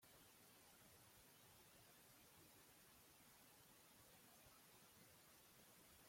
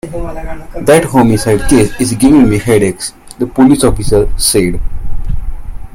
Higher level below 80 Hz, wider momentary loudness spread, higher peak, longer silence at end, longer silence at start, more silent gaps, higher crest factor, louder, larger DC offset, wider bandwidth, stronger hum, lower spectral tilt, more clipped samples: second, -88 dBFS vs -20 dBFS; second, 1 LU vs 16 LU; second, -56 dBFS vs 0 dBFS; about the same, 0 s vs 0 s; about the same, 0 s vs 0.05 s; neither; about the same, 14 dB vs 10 dB; second, -68 LUFS vs -10 LUFS; neither; about the same, 16.5 kHz vs 16.5 kHz; neither; second, -2.5 dB/octave vs -5 dB/octave; second, under 0.1% vs 0.3%